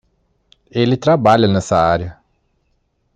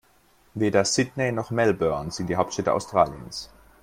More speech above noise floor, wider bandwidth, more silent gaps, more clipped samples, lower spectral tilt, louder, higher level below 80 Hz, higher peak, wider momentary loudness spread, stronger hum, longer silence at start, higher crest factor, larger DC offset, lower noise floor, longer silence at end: first, 51 dB vs 36 dB; second, 9.6 kHz vs 16 kHz; neither; neither; first, -6.5 dB/octave vs -4.5 dB/octave; first, -15 LUFS vs -24 LUFS; first, -48 dBFS vs -54 dBFS; first, 0 dBFS vs -4 dBFS; second, 11 LU vs 14 LU; neither; first, 0.75 s vs 0.55 s; about the same, 16 dB vs 20 dB; neither; first, -64 dBFS vs -60 dBFS; first, 1.05 s vs 0.35 s